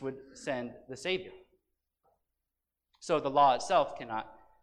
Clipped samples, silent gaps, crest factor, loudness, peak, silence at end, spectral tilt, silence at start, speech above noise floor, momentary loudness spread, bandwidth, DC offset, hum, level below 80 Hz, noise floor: under 0.1%; none; 20 dB; -31 LUFS; -14 dBFS; 0.3 s; -4 dB/octave; 0 s; 56 dB; 19 LU; 10.5 kHz; under 0.1%; none; -70 dBFS; -88 dBFS